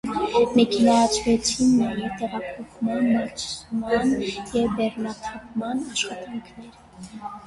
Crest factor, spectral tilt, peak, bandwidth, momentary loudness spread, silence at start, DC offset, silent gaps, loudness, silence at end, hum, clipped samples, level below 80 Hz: 16 dB; -4 dB/octave; -6 dBFS; 11.5 kHz; 17 LU; 0.05 s; under 0.1%; none; -23 LUFS; 0 s; none; under 0.1%; -50 dBFS